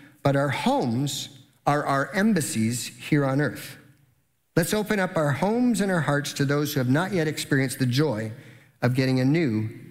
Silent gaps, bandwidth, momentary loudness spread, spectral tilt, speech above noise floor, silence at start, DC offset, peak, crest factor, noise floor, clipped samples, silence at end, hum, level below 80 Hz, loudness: none; 16 kHz; 7 LU; -5.5 dB/octave; 44 dB; 0.25 s; under 0.1%; -8 dBFS; 16 dB; -67 dBFS; under 0.1%; 0 s; none; -60 dBFS; -24 LUFS